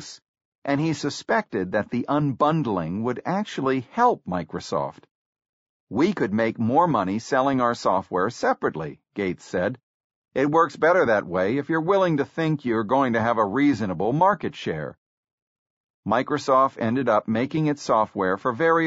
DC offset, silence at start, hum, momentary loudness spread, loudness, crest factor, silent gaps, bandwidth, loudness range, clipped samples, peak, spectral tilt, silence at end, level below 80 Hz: under 0.1%; 0 s; none; 9 LU; -23 LUFS; 16 dB; 0.28-0.34 s, 0.45-0.62 s, 5.11-5.33 s, 5.49-5.87 s, 9.83-10.10 s, 10.16-10.22 s, 14.98-15.23 s, 15.32-16.03 s; 8 kHz; 3 LU; under 0.1%; -6 dBFS; -5.5 dB/octave; 0 s; -60 dBFS